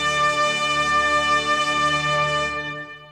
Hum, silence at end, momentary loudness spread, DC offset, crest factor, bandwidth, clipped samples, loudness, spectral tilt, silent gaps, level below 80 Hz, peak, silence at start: none; 0 s; 8 LU; under 0.1%; 12 dB; 13.5 kHz; under 0.1%; -19 LUFS; -2.5 dB/octave; none; -48 dBFS; -8 dBFS; 0 s